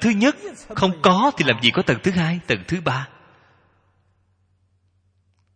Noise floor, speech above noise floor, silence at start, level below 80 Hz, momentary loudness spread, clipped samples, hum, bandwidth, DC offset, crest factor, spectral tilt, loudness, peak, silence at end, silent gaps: -64 dBFS; 44 dB; 0 s; -52 dBFS; 11 LU; under 0.1%; 50 Hz at -50 dBFS; 9.8 kHz; under 0.1%; 22 dB; -5.5 dB/octave; -19 LUFS; 0 dBFS; 2.5 s; none